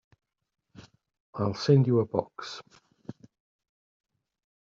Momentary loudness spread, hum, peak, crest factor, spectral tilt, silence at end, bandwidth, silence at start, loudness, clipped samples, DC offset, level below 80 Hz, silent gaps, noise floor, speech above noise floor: 25 LU; none; -10 dBFS; 22 dB; -7.5 dB/octave; 1.5 s; 7.2 kHz; 1.35 s; -26 LUFS; under 0.1%; under 0.1%; -68 dBFS; none; -54 dBFS; 28 dB